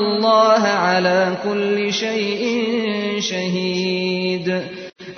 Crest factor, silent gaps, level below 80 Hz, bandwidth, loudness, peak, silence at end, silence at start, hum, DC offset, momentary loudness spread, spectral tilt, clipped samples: 16 dB; none; -64 dBFS; 6.6 kHz; -18 LUFS; -2 dBFS; 0 s; 0 s; none; under 0.1%; 7 LU; -4.5 dB/octave; under 0.1%